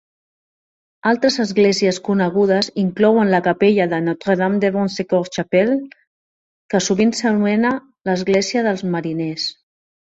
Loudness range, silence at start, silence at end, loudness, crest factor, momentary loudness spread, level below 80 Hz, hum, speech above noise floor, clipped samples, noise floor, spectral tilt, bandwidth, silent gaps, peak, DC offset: 3 LU; 1.05 s; 0.6 s; -18 LUFS; 16 dB; 8 LU; -58 dBFS; none; over 73 dB; under 0.1%; under -90 dBFS; -5 dB/octave; 8 kHz; 6.07-6.69 s; -2 dBFS; under 0.1%